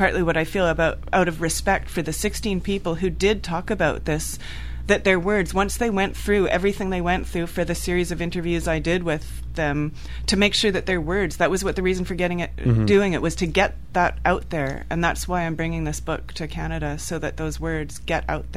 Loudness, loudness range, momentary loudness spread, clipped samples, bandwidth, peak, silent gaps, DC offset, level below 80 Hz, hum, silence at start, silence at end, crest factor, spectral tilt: -23 LUFS; 3 LU; 9 LU; under 0.1%; 15.5 kHz; -2 dBFS; none; 1%; -34 dBFS; none; 0 s; 0 s; 20 dB; -5 dB/octave